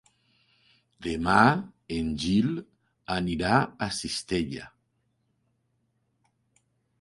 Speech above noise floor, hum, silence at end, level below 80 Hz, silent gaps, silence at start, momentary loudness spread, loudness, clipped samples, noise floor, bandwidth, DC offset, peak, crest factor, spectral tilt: 48 dB; none; 2.35 s; -50 dBFS; none; 1 s; 15 LU; -27 LUFS; under 0.1%; -74 dBFS; 11.5 kHz; under 0.1%; -4 dBFS; 26 dB; -5 dB/octave